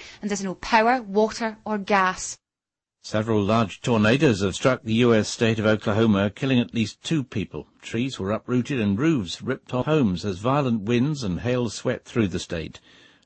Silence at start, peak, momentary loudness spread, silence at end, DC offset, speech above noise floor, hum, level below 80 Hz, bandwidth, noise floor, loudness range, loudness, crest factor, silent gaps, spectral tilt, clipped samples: 0 s; -6 dBFS; 10 LU; 0.5 s; under 0.1%; 67 dB; none; -52 dBFS; 8.8 kHz; -89 dBFS; 4 LU; -23 LUFS; 16 dB; none; -5.5 dB/octave; under 0.1%